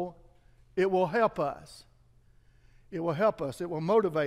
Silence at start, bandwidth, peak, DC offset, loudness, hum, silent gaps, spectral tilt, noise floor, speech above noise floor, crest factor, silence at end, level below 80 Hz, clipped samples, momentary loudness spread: 0 s; 14.5 kHz; -12 dBFS; under 0.1%; -29 LUFS; none; none; -7 dB/octave; -61 dBFS; 33 dB; 18 dB; 0 s; -62 dBFS; under 0.1%; 14 LU